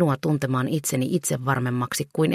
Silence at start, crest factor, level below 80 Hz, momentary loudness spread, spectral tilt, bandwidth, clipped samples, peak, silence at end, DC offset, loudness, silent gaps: 0 s; 16 dB; -60 dBFS; 2 LU; -5.5 dB/octave; 15.5 kHz; under 0.1%; -8 dBFS; 0 s; under 0.1%; -24 LUFS; none